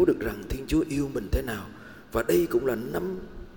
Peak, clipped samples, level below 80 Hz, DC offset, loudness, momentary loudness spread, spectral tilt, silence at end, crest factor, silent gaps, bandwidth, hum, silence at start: -10 dBFS; under 0.1%; -40 dBFS; 0.2%; -28 LUFS; 12 LU; -6.5 dB/octave; 0 s; 18 dB; none; 18 kHz; none; 0 s